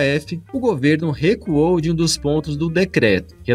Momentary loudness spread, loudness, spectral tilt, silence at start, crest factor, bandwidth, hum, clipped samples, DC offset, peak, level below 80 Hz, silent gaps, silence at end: 5 LU; -18 LUFS; -5.5 dB/octave; 0 s; 16 dB; 15 kHz; none; under 0.1%; under 0.1%; -2 dBFS; -40 dBFS; none; 0 s